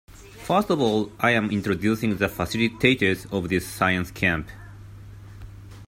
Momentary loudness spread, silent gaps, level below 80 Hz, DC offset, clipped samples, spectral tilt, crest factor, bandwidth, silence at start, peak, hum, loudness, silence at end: 23 LU; none; -48 dBFS; under 0.1%; under 0.1%; -5.5 dB/octave; 20 dB; 16 kHz; 0.15 s; -4 dBFS; none; -23 LUFS; 0 s